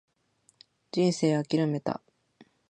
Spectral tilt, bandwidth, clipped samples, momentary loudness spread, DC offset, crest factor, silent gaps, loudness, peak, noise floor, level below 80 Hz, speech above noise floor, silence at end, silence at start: -6.5 dB/octave; 9.8 kHz; under 0.1%; 10 LU; under 0.1%; 18 dB; none; -28 LUFS; -12 dBFS; -68 dBFS; -74 dBFS; 42 dB; 0.25 s; 0.95 s